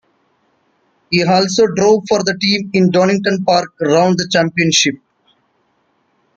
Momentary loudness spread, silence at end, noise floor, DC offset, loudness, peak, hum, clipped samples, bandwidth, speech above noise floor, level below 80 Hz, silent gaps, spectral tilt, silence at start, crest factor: 4 LU; 1.4 s; -61 dBFS; under 0.1%; -13 LUFS; 0 dBFS; none; under 0.1%; 9 kHz; 48 dB; -56 dBFS; none; -4 dB/octave; 1.1 s; 14 dB